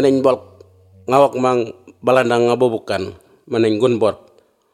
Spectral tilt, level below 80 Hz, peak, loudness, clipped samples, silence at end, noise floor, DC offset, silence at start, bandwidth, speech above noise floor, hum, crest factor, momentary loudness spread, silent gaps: -6 dB/octave; -62 dBFS; 0 dBFS; -17 LUFS; under 0.1%; 0.6 s; -46 dBFS; under 0.1%; 0 s; 13.5 kHz; 31 dB; none; 18 dB; 11 LU; none